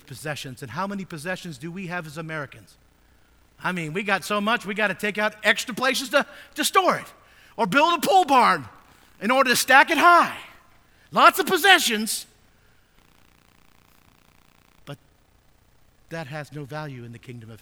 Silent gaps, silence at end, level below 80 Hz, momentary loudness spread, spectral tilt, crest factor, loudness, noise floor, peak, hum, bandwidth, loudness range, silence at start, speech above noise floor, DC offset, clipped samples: none; 0.05 s; -62 dBFS; 20 LU; -3 dB/octave; 24 dB; -21 LUFS; -59 dBFS; 0 dBFS; none; over 20 kHz; 19 LU; 0.1 s; 37 dB; under 0.1%; under 0.1%